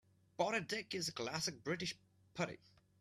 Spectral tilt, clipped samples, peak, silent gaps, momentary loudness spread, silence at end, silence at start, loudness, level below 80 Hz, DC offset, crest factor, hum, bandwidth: -3.5 dB/octave; under 0.1%; -22 dBFS; none; 16 LU; 0.45 s; 0.4 s; -41 LUFS; -76 dBFS; under 0.1%; 22 dB; none; 15 kHz